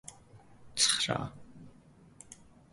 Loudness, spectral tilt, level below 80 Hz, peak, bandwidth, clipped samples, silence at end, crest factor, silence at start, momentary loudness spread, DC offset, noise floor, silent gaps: -29 LUFS; -1.5 dB/octave; -64 dBFS; -12 dBFS; 12 kHz; under 0.1%; 0.4 s; 26 dB; 0.1 s; 26 LU; under 0.1%; -59 dBFS; none